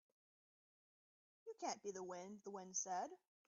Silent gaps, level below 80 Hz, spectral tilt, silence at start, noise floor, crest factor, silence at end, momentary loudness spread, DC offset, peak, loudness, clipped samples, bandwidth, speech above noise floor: none; under -90 dBFS; -3.5 dB/octave; 1.45 s; under -90 dBFS; 20 dB; 0.3 s; 10 LU; under 0.1%; -32 dBFS; -48 LUFS; under 0.1%; 7.4 kHz; over 41 dB